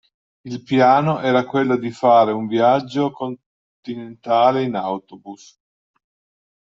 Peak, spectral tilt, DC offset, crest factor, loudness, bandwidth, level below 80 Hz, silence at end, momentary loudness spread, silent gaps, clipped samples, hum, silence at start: -2 dBFS; -7 dB/octave; under 0.1%; 16 dB; -17 LUFS; 7.6 kHz; -64 dBFS; 1.25 s; 19 LU; 3.46-3.83 s; under 0.1%; none; 0.45 s